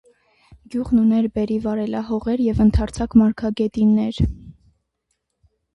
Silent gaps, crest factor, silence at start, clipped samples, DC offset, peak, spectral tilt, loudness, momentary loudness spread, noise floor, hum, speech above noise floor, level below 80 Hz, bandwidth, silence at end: none; 18 dB; 0.5 s; under 0.1%; under 0.1%; -2 dBFS; -8 dB/octave; -20 LUFS; 8 LU; -74 dBFS; none; 56 dB; -34 dBFS; 10.5 kHz; 1.25 s